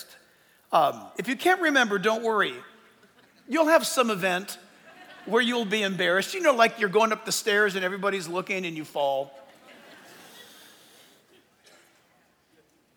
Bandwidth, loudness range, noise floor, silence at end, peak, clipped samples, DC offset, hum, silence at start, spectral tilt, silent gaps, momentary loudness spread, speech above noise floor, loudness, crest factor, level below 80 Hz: over 20 kHz; 9 LU; -64 dBFS; 2.55 s; -6 dBFS; under 0.1%; under 0.1%; none; 0 s; -3 dB/octave; none; 11 LU; 39 dB; -24 LUFS; 22 dB; -84 dBFS